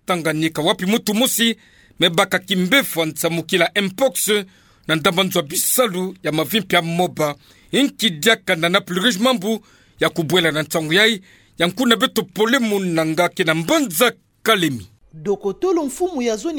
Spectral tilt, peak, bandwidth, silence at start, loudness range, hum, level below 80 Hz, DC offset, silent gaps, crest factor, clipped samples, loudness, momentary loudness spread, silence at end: -3.5 dB/octave; 0 dBFS; 19.5 kHz; 0.1 s; 1 LU; none; -58 dBFS; under 0.1%; none; 18 dB; under 0.1%; -18 LUFS; 7 LU; 0 s